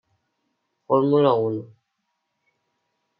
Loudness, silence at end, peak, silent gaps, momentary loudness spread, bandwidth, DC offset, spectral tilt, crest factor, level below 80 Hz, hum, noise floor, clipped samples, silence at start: -20 LUFS; 1.55 s; -6 dBFS; none; 10 LU; 5.2 kHz; under 0.1%; -11 dB/octave; 20 dB; -76 dBFS; none; -77 dBFS; under 0.1%; 0.9 s